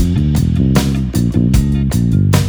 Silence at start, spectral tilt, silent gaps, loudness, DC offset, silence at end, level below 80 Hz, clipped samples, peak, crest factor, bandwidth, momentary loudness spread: 0 s; -7 dB/octave; none; -14 LUFS; under 0.1%; 0 s; -20 dBFS; under 0.1%; 0 dBFS; 12 dB; over 20 kHz; 2 LU